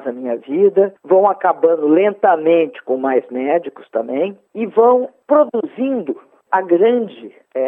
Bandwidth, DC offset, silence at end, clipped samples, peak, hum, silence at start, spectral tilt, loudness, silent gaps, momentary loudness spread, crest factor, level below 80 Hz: 3.7 kHz; under 0.1%; 0 s; under 0.1%; -2 dBFS; none; 0 s; -9.5 dB/octave; -16 LUFS; none; 11 LU; 14 dB; -80 dBFS